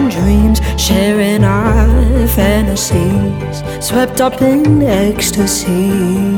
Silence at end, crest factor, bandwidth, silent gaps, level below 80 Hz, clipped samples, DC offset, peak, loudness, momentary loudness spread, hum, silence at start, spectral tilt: 0 s; 10 dB; 18.5 kHz; none; -18 dBFS; under 0.1%; under 0.1%; 0 dBFS; -12 LUFS; 4 LU; none; 0 s; -5.5 dB/octave